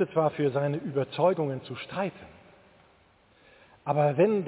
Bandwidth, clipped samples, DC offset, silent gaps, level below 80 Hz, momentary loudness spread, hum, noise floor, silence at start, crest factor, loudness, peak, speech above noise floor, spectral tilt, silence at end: 4 kHz; under 0.1%; under 0.1%; none; -68 dBFS; 12 LU; none; -62 dBFS; 0 s; 18 dB; -28 LUFS; -12 dBFS; 35 dB; -11 dB/octave; 0 s